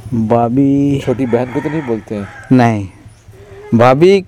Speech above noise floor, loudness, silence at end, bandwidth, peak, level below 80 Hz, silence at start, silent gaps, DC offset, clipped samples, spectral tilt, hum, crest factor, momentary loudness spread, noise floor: 26 dB; -13 LUFS; 0 s; 11 kHz; 0 dBFS; -44 dBFS; 0 s; none; under 0.1%; 0.1%; -8 dB/octave; none; 12 dB; 12 LU; -38 dBFS